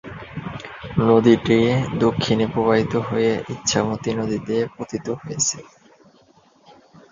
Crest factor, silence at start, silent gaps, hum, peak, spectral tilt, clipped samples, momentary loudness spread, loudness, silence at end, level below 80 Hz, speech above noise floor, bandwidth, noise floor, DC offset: 20 dB; 0.05 s; none; none; -2 dBFS; -5 dB/octave; under 0.1%; 17 LU; -20 LUFS; 1.5 s; -48 dBFS; 35 dB; 7.6 kHz; -55 dBFS; under 0.1%